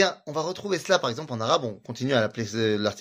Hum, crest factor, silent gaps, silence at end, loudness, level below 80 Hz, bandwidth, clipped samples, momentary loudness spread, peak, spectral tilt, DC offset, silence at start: none; 20 dB; none; 0 s; -26 LUFS; -66 dBFS; 15.5 kHz; under 0.1%; 6 LU; -6 dBFS; -4.5 dB/octave; under 0.1%; 0 s